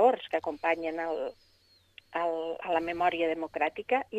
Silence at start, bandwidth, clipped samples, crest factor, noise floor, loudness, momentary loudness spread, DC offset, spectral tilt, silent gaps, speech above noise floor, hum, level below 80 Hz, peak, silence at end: 0 s; 9.2 kHz; under 0.1%; 18 dB; -65 dBFS; -31 LUFS; 7 LU; under 0.1%; -5 dB/octave; none; 34 dB; none; -68 dBFS; -12 dBFS; 0 s